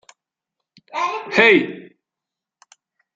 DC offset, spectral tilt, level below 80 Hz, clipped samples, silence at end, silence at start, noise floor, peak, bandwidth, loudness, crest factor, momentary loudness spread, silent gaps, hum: under 0.1%; -4.5 dB/octave; -68 dBFS; under 0.1%; 1.35 s; 0.95 s; -86 dBFS; 0 dBFS; 7.8 kHz; -16 LUFS; 22 dB; 18 LU; none; none